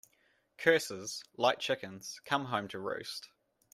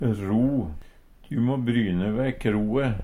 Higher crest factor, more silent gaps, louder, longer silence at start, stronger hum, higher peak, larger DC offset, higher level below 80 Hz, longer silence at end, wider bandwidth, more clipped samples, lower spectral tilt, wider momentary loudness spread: first, 24 dB vs 16 dB; neither; second, -34 LUFS vs -25 LUFS; first, 0.6 s vs 0 s; neither; about the same, -10 dBFS vs -10 dBFS; neither; second, -76 dBFS vs -42 dBFS; first, 0.5 s vs 0 s; first, 15.5 kHz vs 11.5 kHz; neither; second, -3 dB/octave vs -8.5 dB/octave; first, 14 LU vs 8 LU